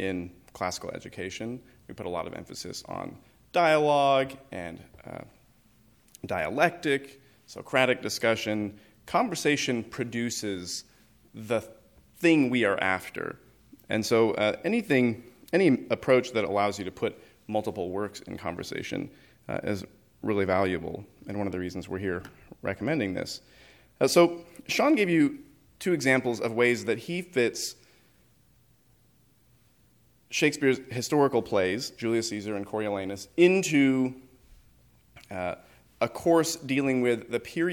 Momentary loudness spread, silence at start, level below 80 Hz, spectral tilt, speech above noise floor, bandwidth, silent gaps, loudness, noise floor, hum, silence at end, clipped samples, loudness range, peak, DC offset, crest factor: 16 LU; 0 s; -64 dBFS; -4.5 dB/octave; 36 dB; 19 kHz; none; -27 LUFS; -64 dBFS; none; 0 s; under 0.1%; 7 LU; -6 dBFS; under 0.1%; 22 dB